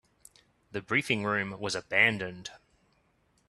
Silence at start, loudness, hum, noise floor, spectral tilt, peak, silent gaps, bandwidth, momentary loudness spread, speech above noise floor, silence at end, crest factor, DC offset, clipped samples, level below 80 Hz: 0.75 s; -28 LUFS; none; -70 dBFS; -4 dB/octave; -8 dBFS; none; 13 kHz; 17 LU; 40 dB; 0.9 s; 24 dB; under 0.1%; under 0.1%; -68 dBFS